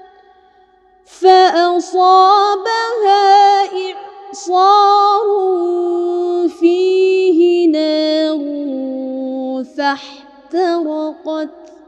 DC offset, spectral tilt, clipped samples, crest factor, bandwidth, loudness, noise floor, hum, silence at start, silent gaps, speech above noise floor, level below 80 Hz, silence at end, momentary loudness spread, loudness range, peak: under 0.1%; -2 dB/octave; under 0.1%; 14 dB; 8.8 kHz; -13 LUFS; -50 dBFS; none; 1.2 s; none; 38 dB; -68 dBFS; 0.2 s; 14 LU; 7 LU; 0 dBFS